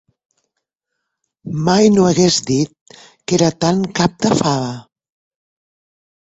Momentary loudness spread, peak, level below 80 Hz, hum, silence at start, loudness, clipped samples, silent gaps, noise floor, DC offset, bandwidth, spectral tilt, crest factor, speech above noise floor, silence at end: 15 LU; -2 dBFS; -50 dBFS; none; 1.45 s; -15 LUFS; under 0.1%; 2.81-2.86 s; -77 dBFS; under 0.1%; 8.2 kHz; -5 dB/octave; 16 dB; 63 dB; 1.4 s